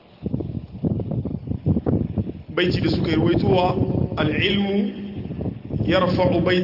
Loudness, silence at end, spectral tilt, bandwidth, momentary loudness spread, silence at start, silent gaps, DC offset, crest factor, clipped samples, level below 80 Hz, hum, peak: -22 LUFS; 0 s; -8.5 dB/octave; 5.8 kHz; 10 LU; 0.2 s; none; under 0.1%; 16 dB; under 0.1%; -40 dBFS; none; -6 dBFS